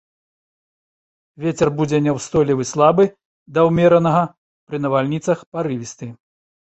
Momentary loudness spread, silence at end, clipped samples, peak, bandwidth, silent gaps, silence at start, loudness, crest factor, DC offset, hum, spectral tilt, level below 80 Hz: 13 LU; 0.5 s; under 0.1%; -2 dBFS; 8.4 kHz; 3.25-3.46 s, 4.38-4.67 s, 5.46-5.52 s; 1.4 s; -18 LUFS; 18 dB; under 0.1%; none; -6.5 dB/octave; -52 dBFS